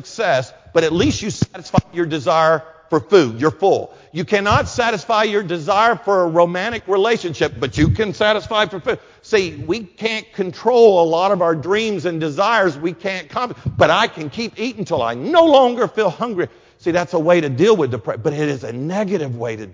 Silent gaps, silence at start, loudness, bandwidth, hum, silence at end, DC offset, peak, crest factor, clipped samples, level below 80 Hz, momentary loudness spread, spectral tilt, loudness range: none; 0.05 s; -17 LUFS; 7.6 kHz; none; 0 s; under 0.1%; 0 dBFS; 16 dB; under 0.1%; -42 dBFS; 10 LU; -5.5 dB/octave; 2 LU